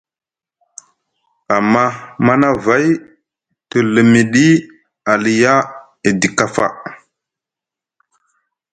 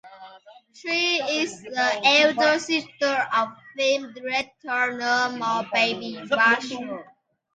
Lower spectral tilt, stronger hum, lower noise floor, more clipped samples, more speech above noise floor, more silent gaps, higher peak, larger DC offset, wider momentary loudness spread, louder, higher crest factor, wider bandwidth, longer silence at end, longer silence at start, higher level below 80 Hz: first, -5.5 dB/octave vs -2 dB/octave; neither; first, -90 dBFS vs -49 dBFS; neither; first, 77 dB vs 25 dB; neither; first, 0 dBFS vs -6 dBFS; neither; about the same, 10 LU vs 12 LU; first, -14 LUFS vs -22 LUFS; about the same, 16 dB vs 18 dB; about the same, 9.4 kHz vs 9.4 kHz; first, 1.8 s vs 0.5 s; first, 1.5 s vs 0.05 s; first, -54 dBFS vs -72 dBFS